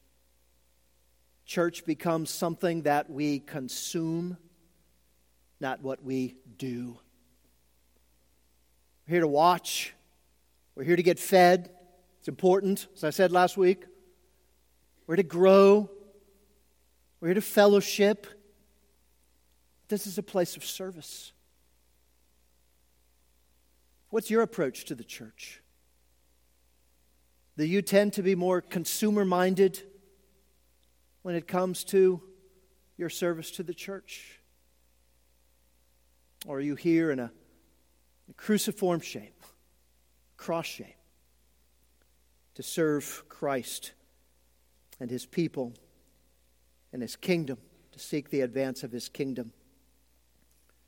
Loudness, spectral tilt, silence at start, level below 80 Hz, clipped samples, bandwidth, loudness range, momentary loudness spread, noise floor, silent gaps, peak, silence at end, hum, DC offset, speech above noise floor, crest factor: -28 LUFS; -5 dB/octave; 1.5 s; -70 dBFS; under 0.1%; 17 kHz; 13 LU; 19 LU; -69 dBFS; none; -6 dBFS; 1.4 s; none; under 0.1%; 41 dB; 24 dB